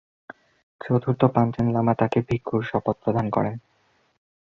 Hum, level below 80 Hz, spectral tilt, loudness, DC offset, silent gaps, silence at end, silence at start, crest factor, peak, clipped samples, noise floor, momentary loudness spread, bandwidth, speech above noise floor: none; -52 dBFS; -9.5 dB/octave; -23 LUFS; under 0.1%; none; 0.95 s; 0.85 s; 22 dB; -2 dBFS; under 0.1%; -65 dBFS; 6 LU; 6.8 kHz; 42 dB